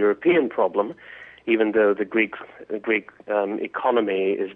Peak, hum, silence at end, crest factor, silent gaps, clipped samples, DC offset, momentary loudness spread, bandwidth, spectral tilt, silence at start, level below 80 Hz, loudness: -8 dBFS; none; 0 s; 14 dB; none; under 0.1%; under 0.1%; 14 LU; 3.9 kHz; -8.5 dB/octave; 0 s; -68 dBFS; -22 LUFS